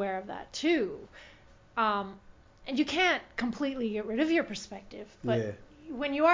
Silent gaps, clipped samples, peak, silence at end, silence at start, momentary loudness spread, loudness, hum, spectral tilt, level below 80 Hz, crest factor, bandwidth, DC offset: none; under 0.1%; -12 dBFS; 0 s; 0 s; 17 LU; -31 LUFS; none; -5 dB/octave; -60 dBFS; 20 dB; 7.6 kHz; under 0.1%